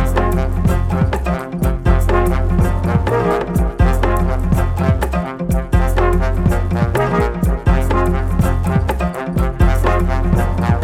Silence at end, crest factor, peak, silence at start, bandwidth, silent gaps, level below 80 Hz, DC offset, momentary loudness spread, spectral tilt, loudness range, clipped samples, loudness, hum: 0 s; 14 dB; 0 dBFS; 0 s; 15 kHz; none; -18 dBFS; under 0.1%; 4 LU; -7.5 dB/octave; 1 LU; under 0.1%; -17 LUFS; none